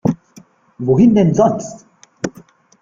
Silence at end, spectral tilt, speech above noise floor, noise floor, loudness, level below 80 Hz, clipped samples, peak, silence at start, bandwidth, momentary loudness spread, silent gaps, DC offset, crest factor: 0.55 s; -8 dB/octave; 33 dB; -46 dBFS; -14 LUFS; -50 dBFS; under 0.1%; -2 dBFS; 0.05 s; 7.6 kHz; 17 LU; none; under 0.1%; 16 dB